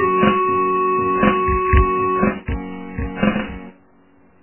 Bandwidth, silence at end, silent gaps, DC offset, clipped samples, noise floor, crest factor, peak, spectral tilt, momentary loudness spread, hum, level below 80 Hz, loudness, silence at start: 3.2 kHz; 0.7 s; none; under 0.1%; under 0.1%; -53 dBFS; 16 dB; -2 dBFS; -11 dB/octave; 12 LU; none; -28 dBFS; -18 LUFS; 0 s